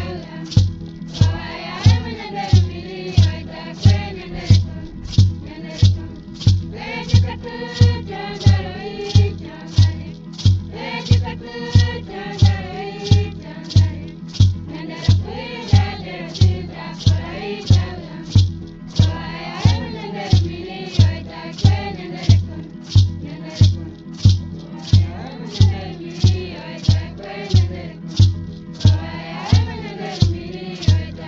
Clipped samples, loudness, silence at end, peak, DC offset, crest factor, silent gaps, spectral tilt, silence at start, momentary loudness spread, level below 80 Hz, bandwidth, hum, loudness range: under 0.1%; -19 LUFS; 0 s; 0 dBFS; under 0.1%; 18 dB; none; -6.5 dB/octave; 0 s; 13 LU; -34 dBFS; 7.2 kHz; none; 2 LU